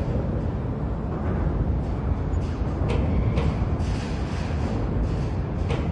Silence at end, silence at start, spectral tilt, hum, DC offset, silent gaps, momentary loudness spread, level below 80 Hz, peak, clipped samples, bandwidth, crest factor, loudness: 0 s; 0 s; -8.5 dB/octave; none; under 0.1%; none; 4 LU; -30 dBFS; -10 dBFS; under 0.1%; 9.4 kHz; 14 dB; -26 LUFS